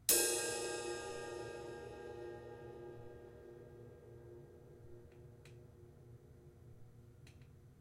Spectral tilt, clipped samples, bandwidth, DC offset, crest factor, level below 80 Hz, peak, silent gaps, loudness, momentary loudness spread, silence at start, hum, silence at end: -2 dB/octave; under 0.1%; 16.5 kHz; under 0.1%; 30 dB; -68 dBFS; -16 dBFS; none; -41 LUFS; 22 LU; 0 s; none; 0 s